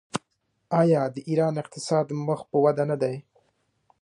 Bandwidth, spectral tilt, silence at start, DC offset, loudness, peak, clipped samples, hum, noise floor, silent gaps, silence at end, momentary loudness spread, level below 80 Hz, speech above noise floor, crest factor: 11 kHz; -7 dB/octave; 0.15 s; under 0.1%; -25 LUFS; -8 dBFS; under 0.1%; none; -73 dBFS; none; 0.8 s; 11 LU; -70 dBFS; 49 dB; 18 dB